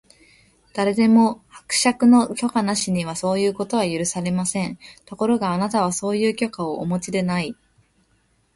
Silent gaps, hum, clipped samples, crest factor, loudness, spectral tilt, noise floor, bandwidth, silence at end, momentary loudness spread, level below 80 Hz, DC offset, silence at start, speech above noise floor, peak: none; none; under 0.1%; 18 dB; -21 LUFS; -4.5 dB/octave; -63 dBFS; 11.5 kHz; 1.05 s; 11 LU; -58 dBFS; under 0.1%; 0.75 s; 43 dB; -4 dBFS